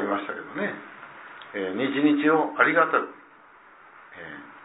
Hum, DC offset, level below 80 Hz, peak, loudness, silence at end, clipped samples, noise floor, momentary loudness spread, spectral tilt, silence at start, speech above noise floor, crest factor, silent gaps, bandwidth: none; under 0.1%; -76 dBFS; -4 dBFS; -24 LUFS; 0 s; under 0.1%; -52 dBFS; 22 LU; -9 dB/octave; 0 s; 28 dB; 22 dB; none; 4 kHz